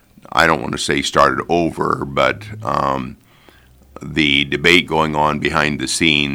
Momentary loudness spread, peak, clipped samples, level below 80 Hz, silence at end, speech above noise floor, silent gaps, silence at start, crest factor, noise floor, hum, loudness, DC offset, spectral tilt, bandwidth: 9 LU; 0 dBFS; under 0.1%; -42 dBFS; 0 s; 31 dB; none; 0.35 s; 18 dB; -48 dBFS; none; -16 LUFS; under 0.1%; -4 dB/octave; over 20 kHz